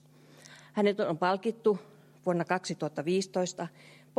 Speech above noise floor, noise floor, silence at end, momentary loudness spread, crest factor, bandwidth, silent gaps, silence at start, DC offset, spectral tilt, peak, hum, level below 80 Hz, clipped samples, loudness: 26 dB; -56 dBFS; 0.5 s; 9 LU; 20 dB; 13 kHz; none; 0.45 s; under 0.1%; -5.5 dB/octave; -12 dBFS; none; -82 dBFS; under 0.1%; -31 LUFS